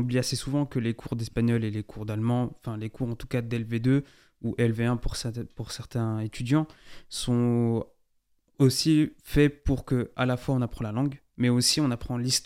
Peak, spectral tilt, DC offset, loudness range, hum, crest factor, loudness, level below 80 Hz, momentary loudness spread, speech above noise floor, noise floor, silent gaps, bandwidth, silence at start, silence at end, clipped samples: -8 dBFS; -5.5 dB/octave; under 0.1%; 4 LU; none; 18 dB; -28 LUFS; -44 dBFS; 11 LU; 43 dB; -69 dBFS; none; 16 kHz; 0 s; 0 s; under 0.1%